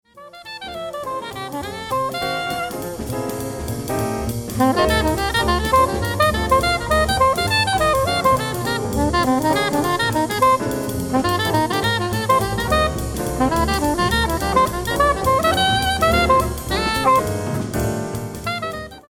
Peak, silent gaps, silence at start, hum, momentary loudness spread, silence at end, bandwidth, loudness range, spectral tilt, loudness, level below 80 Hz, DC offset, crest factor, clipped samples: -4 dBFS; none; 0.15 s; none; 11 LU; 0.1 s; 19 kHz; 7 LU; -4.5 dB/octave; -19 LUFS; -32 dBFS; under 0.1%; 14 dB; under 0.1%